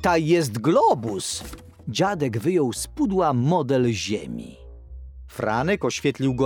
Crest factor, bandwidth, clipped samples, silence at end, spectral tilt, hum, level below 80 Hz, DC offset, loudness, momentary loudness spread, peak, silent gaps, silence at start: 16 dB; 19.5 kHz; under 0.1%; 0 s; -5.5 dB/octave; none; -46 dBFS; under 0.1%; -23 LUFS; 19 LU; -6 dBFS; none; 0 s